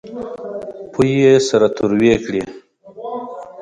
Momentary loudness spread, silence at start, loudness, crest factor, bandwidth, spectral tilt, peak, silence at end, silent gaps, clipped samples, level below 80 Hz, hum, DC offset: 17 LU; 0.05 s; -15 LUFS; 16 dB; 10.5 kHz; -6 dB/octave; 0 dBFS; 0 s; none; under 0.1%; -48 dBFS; none; under 0.1%